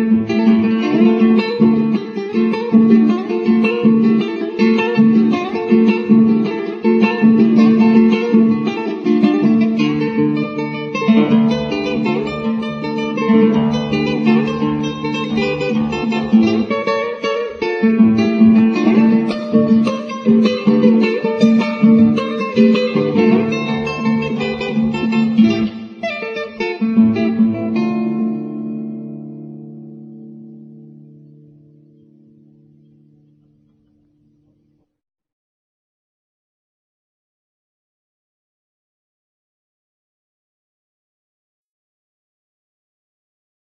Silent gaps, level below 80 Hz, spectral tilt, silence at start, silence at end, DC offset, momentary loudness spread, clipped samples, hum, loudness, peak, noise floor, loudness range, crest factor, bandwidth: none; -52 dBFS; -7.5 dB/octave; 0 s; 12.9 s; under 0.1%; 10 LU; under 0.1%; none; -15 LUFS; 0 dBFS; -61 dBFS; 5 LU; 16 dB; 6.6 kHz